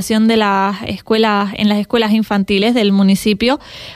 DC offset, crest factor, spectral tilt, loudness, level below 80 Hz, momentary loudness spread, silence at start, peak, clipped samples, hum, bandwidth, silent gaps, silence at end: under 0.1%; 12 dB; -5.5 dB/octave; -14 LUFS; -44 dBFS; 5 LU; 0 s; -2 dBFS; under 0.1%; none; 15 kHz; none; 0 s